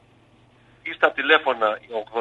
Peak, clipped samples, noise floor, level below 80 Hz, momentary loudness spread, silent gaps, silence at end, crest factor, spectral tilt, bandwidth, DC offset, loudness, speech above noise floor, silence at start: -2 dBFS; under 0.1%; -56 dBFS; -66 dBFS; 15 LU; none; 0 s; 22 dB; -4 dB/octave; 8 kHz; under 0.1%; -21 LUFS; 34 dB; 0.85 s